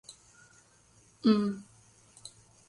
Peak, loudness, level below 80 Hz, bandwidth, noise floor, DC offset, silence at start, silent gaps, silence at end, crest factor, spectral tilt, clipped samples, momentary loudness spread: -14 dBFS; -29 LUFS; -72 dBFS; 11 kHz; -63 dBFS; under 0.1%; 0.1 s; none; 0.4 s; 22 dB; -6 dB/octave; under 0.1%; 24 LU